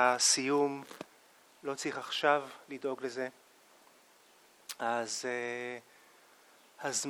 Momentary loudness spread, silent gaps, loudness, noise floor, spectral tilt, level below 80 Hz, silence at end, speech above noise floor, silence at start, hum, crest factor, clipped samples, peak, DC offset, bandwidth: 20 LU; none; -33 LUFS; -63 dBFS; -1.5 dB/octave; -88 dBFS; 0 s; 30 dB; 0 s; none; 22 dB; under 0.1%; -14 dBFS; under 0.1%; 19 kHz